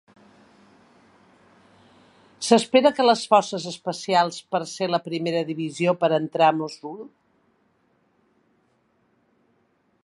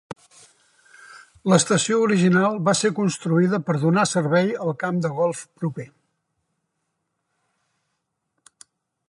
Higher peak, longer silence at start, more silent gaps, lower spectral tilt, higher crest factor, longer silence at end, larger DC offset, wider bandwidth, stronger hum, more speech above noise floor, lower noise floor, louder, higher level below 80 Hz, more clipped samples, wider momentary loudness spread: about the same, -2 dBFS vs -2 dBFS; first, 2.4 s vs 0.1 s; neither; about the same, -4.5 dB/octave vs -5 dB/octave; about the same, 24 dB vs 20 dB; second, 2.95 s vs 3.25 s; neither; about the same, 11.5 kHz vs 11.5 kHz; neither; second, 45 dB vs 56 dB; second, -66 dBFS vs -77 dBFS; about the same, -22 LUFS vs -21 LUFS; second, -76 dBFS vs -68 dBFS; neither; about the same, 14 LU vs 12 LU